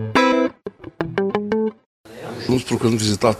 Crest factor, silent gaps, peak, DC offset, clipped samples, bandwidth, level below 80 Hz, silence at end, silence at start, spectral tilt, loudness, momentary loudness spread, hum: 20 dB; 1.86-2.04 s; -2 dBFS; under 0.1%; under 0.1%; 14 kHz; -50 dBFS; 0 s; 0 s; -5 dB/octave; -20 LUFS; 17 LU; none